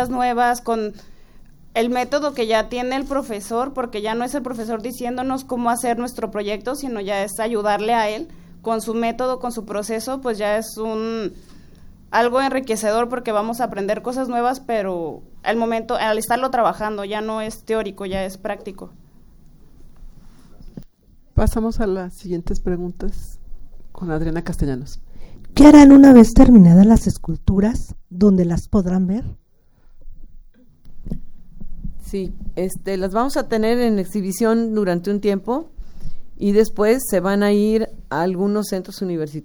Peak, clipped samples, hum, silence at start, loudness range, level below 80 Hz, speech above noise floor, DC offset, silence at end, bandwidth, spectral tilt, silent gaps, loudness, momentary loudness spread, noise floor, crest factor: 0 dBFS; under 0.1%; none; 0 s; 17 LU; -32 dBFS; 33 dB; under 0.1%; 0.05 s; over 20 kHz; -6.5 dB/octave; none; -18 LUFS; 13 LU; -50 dBFS; 18 dB